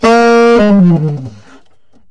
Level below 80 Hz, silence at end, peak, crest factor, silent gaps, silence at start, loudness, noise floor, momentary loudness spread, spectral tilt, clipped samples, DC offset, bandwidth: -40 dBFS; 0.8 s; -2 dBFS; 8 dB; none; 0 s; -8 LUFS; -53 dBFS; 16 LU; -7 dB/octave; under 0.1%; under 0.1%; 10.5 kHz